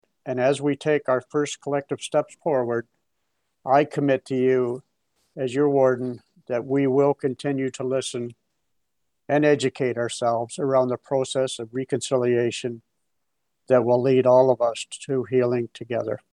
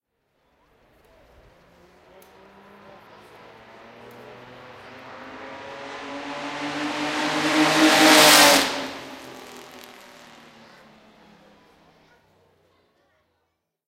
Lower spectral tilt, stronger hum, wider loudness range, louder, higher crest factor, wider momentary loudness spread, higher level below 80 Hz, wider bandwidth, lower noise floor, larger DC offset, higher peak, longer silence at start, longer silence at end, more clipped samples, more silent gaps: first, -5.5 dB/octave vs -1.5 dB/octave; neither; second, 3 LU vs 23 LU; second, -23 LUFS vs -17 LUFS; second, 18 dB vs 26 dB; second, 11 LU vs 31 LU; second, -74 dBFS vs -62 dBFS; second, 11 kHz vs 16 kHz; first, -80 dBFS vs -76 dBFS; neither; second, -6 dBFS vs 0 dBFS; second, 0.25 s vs 4.3 s; second, 0.15 s vs 4.25 s; neither; neither